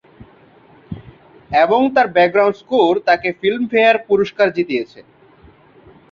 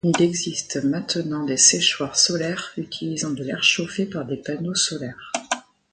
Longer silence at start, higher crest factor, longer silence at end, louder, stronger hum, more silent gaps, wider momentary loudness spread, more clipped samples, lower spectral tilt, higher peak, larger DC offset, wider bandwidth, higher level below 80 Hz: first, 0.2 s vs 0.05 s; second, 16 dB vs 22 dB; first, 1.1 s vs 0.3 s; first, -15 LUFS vs -21 LUFS; neither; neither; first, 19 LU vs 14 LU; neither; first, -6.5 dB/octave vs -2.5 dB/octave; about the same, -2 dBFS vs -2 dBFS; neither; second, 7 kHz vs 9.6 kHz; first, -54 dBFS vs -62 dBFS